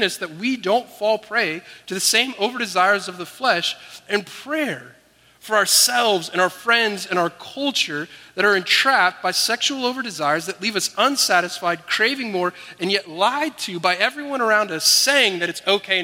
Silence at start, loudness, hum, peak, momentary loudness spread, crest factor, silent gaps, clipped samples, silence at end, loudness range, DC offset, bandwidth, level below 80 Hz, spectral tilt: 0 s; -19 LUFS; none; 0 dBFS; 10 LU; 20 dB; none; under 0.1%; 0 s; 2 LU; under 0.1%; 16.5 kHz; -72 dBFS; -1.5 dB/octave